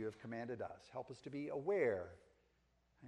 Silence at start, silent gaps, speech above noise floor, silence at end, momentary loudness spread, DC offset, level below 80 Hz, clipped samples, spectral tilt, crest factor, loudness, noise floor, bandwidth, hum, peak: 0 s; none; 35 dB; 0 s; 13 LU; under 0.1%; -78 dBFS; under 0.1%; -7 dB/octave; 20 dB; -43 LUFS; -78 dBFS; 10 kHz; none; -24 dBFS